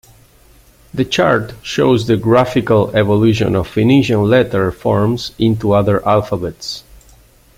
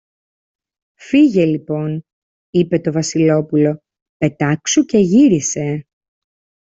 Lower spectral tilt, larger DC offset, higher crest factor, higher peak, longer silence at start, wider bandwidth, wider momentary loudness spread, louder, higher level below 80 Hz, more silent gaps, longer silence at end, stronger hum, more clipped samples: about the same, -6.5 dB/octave vs -5.5 dB/octave; neither; about the same, 14 dB vs 14 dB; about the same, 0 dBFS vs -2 dBFS; about the same, 0.95 s vs 1 s; first, 16 kHz vs 8 kHz; about the same, 9 LU vs 11 LU; about the same, -14 LUFS vs -15 LUFS; first, -42 dBFS vs -56 dBFS; second, none vs 2.13-2.53 s, 4.02-4.20 s; second, 0.75 s vs 0.9 s; neither; neither